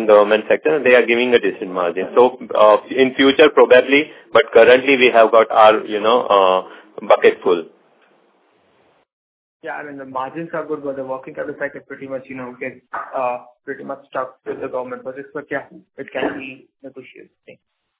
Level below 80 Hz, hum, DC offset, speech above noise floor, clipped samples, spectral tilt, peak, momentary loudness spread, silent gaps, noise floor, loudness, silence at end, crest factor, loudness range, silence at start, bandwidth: -62 dBFS; none; under 0.1%; 42 dB; under 0.1%; -8 dB/octave; 0 dBFS; 19 LU; 9.13-9.60 s; -58 dBFS; -15 LUFS; 1 s; 16 dB; 16 LU; 0 s; 4 kHz